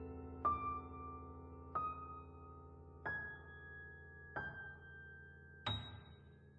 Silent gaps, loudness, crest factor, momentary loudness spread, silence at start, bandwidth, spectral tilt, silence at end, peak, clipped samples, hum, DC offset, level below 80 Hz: none; -47 LUFS; 20 dB; 16 LU; 0 s; 7 kHz; -3 dB/octave; 0 s; -26 dBFS; under 0.1%; none; under 0.1%; -62 dBFS